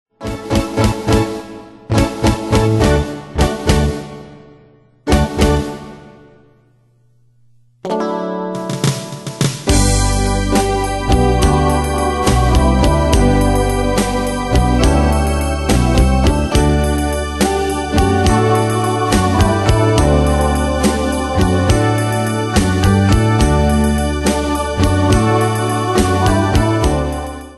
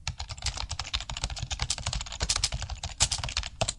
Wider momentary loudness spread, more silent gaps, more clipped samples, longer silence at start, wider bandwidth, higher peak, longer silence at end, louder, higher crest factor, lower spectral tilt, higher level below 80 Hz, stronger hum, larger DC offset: about the same, 7 LU vs 8 LU; neither; neither; first, 0.2 s vs 0 s; about the same, 12.5 kHz vs 11.5 kHz; first, 0 dBFS vs -4 dBFS; about the same, 0 s vs 0 s; first, -15 LUFS vs -31 LUFS; second, 14 dB vs 28 dB; first, -5.5 dB/octave vs -1.5 dB/octave; first, -20 dBFS vs -38 dBFS; neither; neither